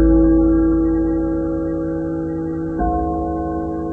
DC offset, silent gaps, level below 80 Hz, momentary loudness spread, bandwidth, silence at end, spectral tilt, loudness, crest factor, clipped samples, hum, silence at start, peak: 0.2%; none; -26 dBFS; 9 LU; 2 kHz; 0 s; -12 dB/octave; -19 LUFS; 12 dB; under 0.1%; none; 0 s; -4 dBFS